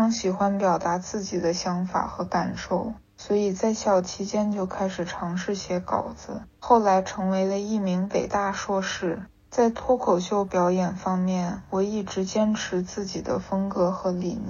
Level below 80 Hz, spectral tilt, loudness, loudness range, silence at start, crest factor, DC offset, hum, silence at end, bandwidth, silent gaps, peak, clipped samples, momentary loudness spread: -54 dBFS; -5.5 dB/octave; -26 LUFS; 2 LU; 0 s; 20 dB; under 0.1%; none; 0 s; 7.4 kHz; none; -6 dBFS; under 0.1%; 7 LU